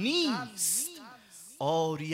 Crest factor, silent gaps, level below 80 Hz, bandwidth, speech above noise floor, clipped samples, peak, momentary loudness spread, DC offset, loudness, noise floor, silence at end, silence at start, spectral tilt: 14 dB; none; -78 dBFS; 16 kHz; 22 dB; under 0.1%; -16 dBFS; 21 LU; under 0.1%; -30 LUFS; -52 dBFS; 0 s; 0 s; -3 dB/octave